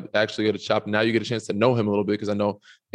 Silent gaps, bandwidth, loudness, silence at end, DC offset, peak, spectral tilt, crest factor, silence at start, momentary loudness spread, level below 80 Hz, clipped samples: none; 10.5 kHz; -24 LUFS; 0.4 s; under 0.1%; -6 dBFS; -6 dB/octave; 18 dB; 0 s; 5 LU; -72 dBFS; under 0.1%